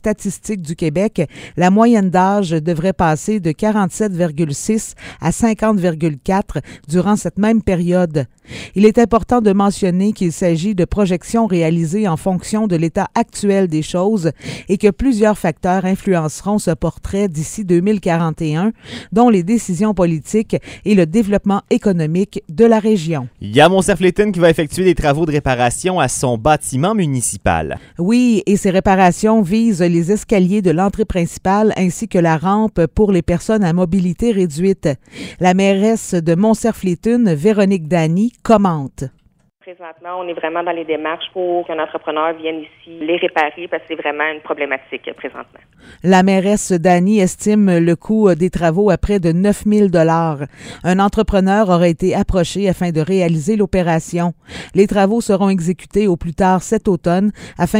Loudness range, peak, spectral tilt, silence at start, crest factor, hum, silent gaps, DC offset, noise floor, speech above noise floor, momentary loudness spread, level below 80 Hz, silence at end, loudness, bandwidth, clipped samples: 5 LU; 0 dBFS; -6 dB/octave; 0.05 s; 14 dB; none; none; under 0.1%; -54 dBFS; 39 dB; 9 LU; -36 dBFS; 0 s; -15 LUFS; 15.5 kHz; under 0.1%